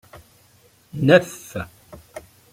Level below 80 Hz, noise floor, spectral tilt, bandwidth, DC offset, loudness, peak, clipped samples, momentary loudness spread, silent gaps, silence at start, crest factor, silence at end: -56 dBFS; -56 dBFS; -6 dB/octave; 16 kHz; under 0.1%; -19 LUFS; -2 dBFS; under 0.1%; 25 LU; none; 0.95 s; 22 dB; 0.35 s